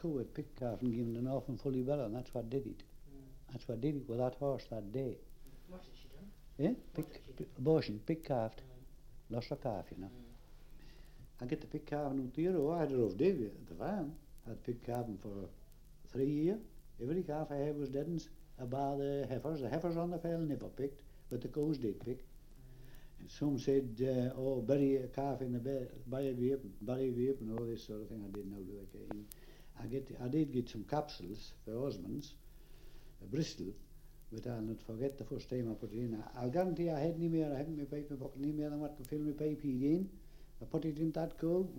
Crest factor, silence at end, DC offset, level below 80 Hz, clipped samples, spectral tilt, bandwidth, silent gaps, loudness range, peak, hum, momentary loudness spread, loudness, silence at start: 20 dB; 0 s; under 0.1%; -56 dBFS; under 0.1%; -8 dB/octave; 16.5 kHz; none; 6 LU; -20 dBFS; none; 17 LU; -39 LUFS; 0 s